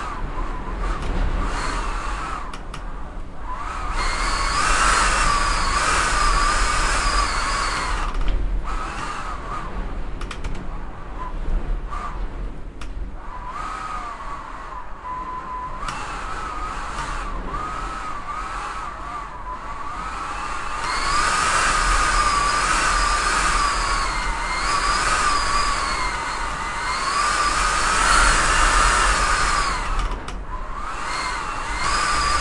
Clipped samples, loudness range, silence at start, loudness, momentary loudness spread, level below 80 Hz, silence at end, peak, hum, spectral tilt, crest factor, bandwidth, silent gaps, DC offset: under 0.1%; 13 LU; 0 s; -22 LUFS; 15 LU; -28 dBFS; 0 s; -2 dBFS; none; -2 dB/octave; 20 dB; 11.5 kHz; none; under 0.1%